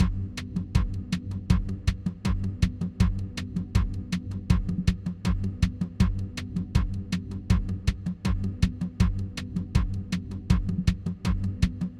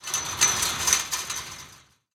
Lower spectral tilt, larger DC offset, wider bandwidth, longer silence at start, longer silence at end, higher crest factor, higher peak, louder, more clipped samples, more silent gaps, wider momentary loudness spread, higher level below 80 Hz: first, -6.5 dB/octave vs 0.5 dB/octave; neither; second, 12.5 kHz vs 19.5 kHz; about the same, 0 s vs 0 s; second, 0 s vs 0.35 s; second, 20 dB vs 26 dB; second, -8 dBFS vs -2 dBFS; second, -29 LUFS vs -23 LUFS; neither; neither; second, 6 LU vs 15 LU; first, -32 dBFS vs -54 dBFS